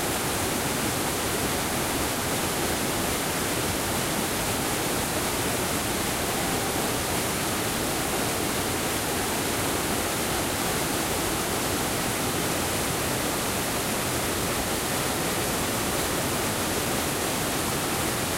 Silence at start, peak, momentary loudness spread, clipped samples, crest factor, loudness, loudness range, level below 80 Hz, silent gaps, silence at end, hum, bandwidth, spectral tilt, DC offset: 0 s; -14 dBFS; 0 LU; under 0.1%; 14 dB; -26 LUFS; 0 LU; -44 dBFS; none; 0 s; none; 16 kHz; -3 dB/octave; under 0.1%